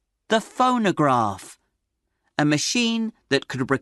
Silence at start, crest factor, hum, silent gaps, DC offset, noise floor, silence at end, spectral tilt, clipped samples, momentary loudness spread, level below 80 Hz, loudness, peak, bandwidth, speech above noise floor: 0.3 s; 18 dB; none; none; under 0.1%; -76 dBFS; 0.05 s; -4 dB/octave; under 0.1%; 8 LU; -64 dBFS; -22 LUFS; -4 dBFS; 12 kHz; 55 dB